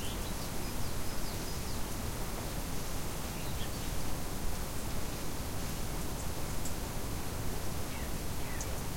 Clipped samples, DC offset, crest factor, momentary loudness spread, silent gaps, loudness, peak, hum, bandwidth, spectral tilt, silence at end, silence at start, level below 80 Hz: under 0.1%; under 0.1%; 12 dB; 1 LU; none; -39 LUFS; -22 dBFS; none; 16.5 kHz; -4 dB/octave; 0 s; 0 s; -42 dBFS